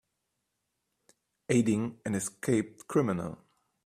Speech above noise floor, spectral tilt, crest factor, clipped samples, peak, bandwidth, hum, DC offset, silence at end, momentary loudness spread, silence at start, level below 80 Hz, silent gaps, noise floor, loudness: 53 dB; -6 dB/octave; 20 dB; under 0.1%; -12 dBFS; 15 kHz; none; under 0.1%; 0.5 s; 13 LU; 1.5 s; -66 dBFS; none; -82 dBFS; -30 LUFS